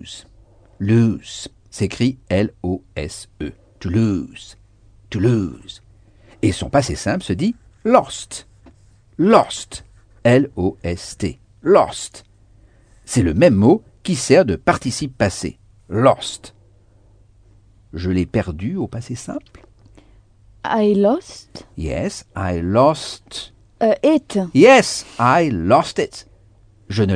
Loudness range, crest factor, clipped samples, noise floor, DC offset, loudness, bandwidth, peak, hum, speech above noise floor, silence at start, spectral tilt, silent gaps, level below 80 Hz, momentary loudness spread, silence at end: 8 LU; 18 dB; under 0.1%; -51 dBFS; under 0.1%; -18 LUFS; 10 kHz; 0 dBFS; none; 33 dB; 0.05 s; -6 dB/octave; none; -42 dBFS; 18 LU; 0 s